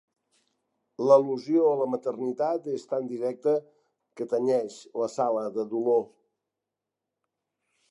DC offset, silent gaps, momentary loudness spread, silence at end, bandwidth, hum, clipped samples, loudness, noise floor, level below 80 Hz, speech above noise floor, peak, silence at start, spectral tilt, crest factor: under 0.1%; none; 11 LU; 1.85 s; 11 kHz; none; under 0.1%; -27 LUFS; -87 dBFS; -86 dBFS; 61 dB; -6 dBFS; 1 s; -7 dB/octave; 22 dB